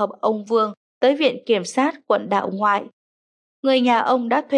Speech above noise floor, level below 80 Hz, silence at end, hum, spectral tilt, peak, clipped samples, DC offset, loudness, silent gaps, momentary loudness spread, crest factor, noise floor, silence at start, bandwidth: over 71 dB; -80 dBFS; 0 s; none; -4.5 dB/octave; -6 dBFS; under 0.1%; under 0.1%; -20 LUFS; 0.77-1.01 s, 2.93-3.63 s; 6 LU; 16 dB; under -90 dBFS; 0 s; 11.5 kHz